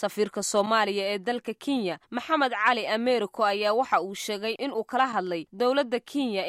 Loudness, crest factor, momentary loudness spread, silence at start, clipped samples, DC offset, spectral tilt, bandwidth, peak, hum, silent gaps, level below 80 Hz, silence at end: -26 LUFS; 18 dB; 7 LU; 0 s; under 0.1%; under 0.1%; -3 dB/octave; 15.5 kHz; -8 dBFS; none; none; -74 dBFS; 0 s